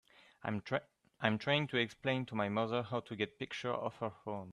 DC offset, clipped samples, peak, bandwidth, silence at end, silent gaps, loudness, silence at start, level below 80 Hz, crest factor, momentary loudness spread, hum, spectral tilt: under 0.1%; under 0.1%; -12 dBFS; 11 kHz; 0 s; none; -37 LUFS; 0.45 s; -74 dBFS; 26 dB; 9 LU; none; -6 dB/octave